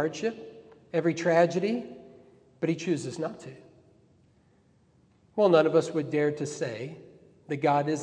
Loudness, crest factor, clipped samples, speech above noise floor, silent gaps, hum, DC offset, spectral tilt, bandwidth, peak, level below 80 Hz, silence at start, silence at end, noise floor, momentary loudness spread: -27 LUFS; 20 dB; under 0.1%; 37 dB; none; none; under 0.1%; -6 dB/octave; 10 kHz; -8 dBFS; -74 dBFS; 0 s; 0 s; -63 dBFS; 22 LU